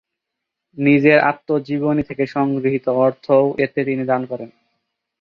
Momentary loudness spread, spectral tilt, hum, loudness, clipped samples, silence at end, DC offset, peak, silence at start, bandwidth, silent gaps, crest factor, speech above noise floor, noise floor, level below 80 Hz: 9 LU; -9 dB/octave; none; -18 LUFS; under 0.1%; 0.75 s; under 0.1%; -2 dBFS; 0.75 s; 5.6 kHz; none; 16 dB; 64 dB; -81 dBFS; -56 dBFS